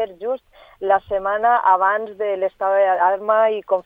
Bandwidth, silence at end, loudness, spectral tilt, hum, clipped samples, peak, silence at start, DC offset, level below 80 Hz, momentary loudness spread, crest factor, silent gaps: 3.8 kHz; 0.05 s; -19 LUFS; -6.5 dB/octave; none; under 0.1%; -2 dBFS; 0 s; under 0.1%; -58 dBFS; 11 LU; 16 dB; none